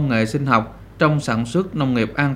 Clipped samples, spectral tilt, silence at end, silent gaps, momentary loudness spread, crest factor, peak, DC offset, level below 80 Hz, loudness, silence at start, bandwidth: under 0.1%; -6.5 dB/octave; 0 s; none; 3 LU; 18 dB; 0 dBFS; under 0.1%; -44 dBFS; -20 LUFS; 0 s; 12.5 kHz